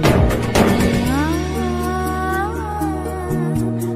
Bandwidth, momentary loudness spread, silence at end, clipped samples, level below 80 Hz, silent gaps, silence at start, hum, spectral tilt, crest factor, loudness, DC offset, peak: 16 kHz; 7 LU; 0 s; under 0.1%; -28 dBFS; none; 0 s; none; -6 dB/octave; 16 dB; -19 LUFS; under 0.1%; 0 dBFS